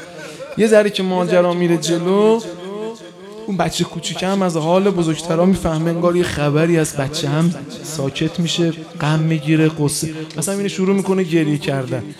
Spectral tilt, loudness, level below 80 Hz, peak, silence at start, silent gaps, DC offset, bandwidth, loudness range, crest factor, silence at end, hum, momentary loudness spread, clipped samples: -5.5 dB/octave; -17 LUFS; -48 dBFS; 0 dBFS; 0 s; none; under 0.1%; 14.5 kHz; 2 LU; 16 dB; 0.05 s; none; 13 LU; under 0.1%